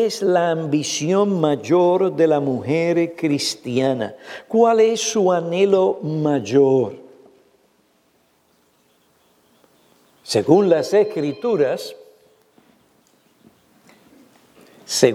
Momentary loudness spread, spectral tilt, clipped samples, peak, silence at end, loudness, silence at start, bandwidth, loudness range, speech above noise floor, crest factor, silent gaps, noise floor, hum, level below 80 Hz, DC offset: 7 LU; -5 dB/octave; under 0.1%; 0 dBFS; 0 s; -18 LUFS; 0 s; 15 kHz; 9 LU; 43 dB; 20 dB; none; -61 dBFS; none; -70 dBFS; under 0.1%